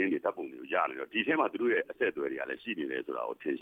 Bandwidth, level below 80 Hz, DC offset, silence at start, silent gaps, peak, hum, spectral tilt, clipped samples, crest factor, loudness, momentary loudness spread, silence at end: 4.6 kHz; -78 dBFS; under 0.1%; 0 s; none; -14 dBFS; none; -6.5 dB/octave; under 0.1%; 18 dB; -33 LUFS; 7 LU; 0 s